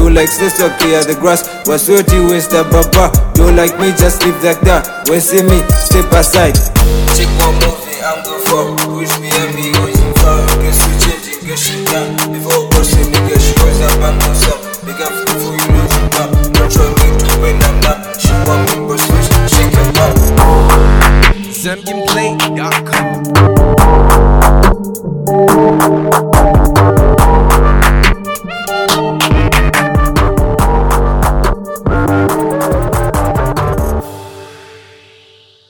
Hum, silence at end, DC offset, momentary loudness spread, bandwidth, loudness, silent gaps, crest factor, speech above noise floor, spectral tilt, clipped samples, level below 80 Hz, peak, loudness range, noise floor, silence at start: none; 0.9 s; under 0.1%; 7 LU; 19.5 kHz; -10 LUFS; none; 10 dB; 35 dB; -4.5 dB/octave; 1%; -12 dBFS; 0 dBFS; 3 LU; -44 dBFS; 0 s